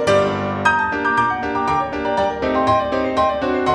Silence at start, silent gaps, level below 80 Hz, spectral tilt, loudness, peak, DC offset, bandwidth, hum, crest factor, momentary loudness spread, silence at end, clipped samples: 0 s; none; -44 dBFS; -5.5 dB/octave; -18 LUFS; -2 dBFS; under 0.1%; 11.5 kHz; none; 18 dB; 3 LU; 0 s; under 0.1%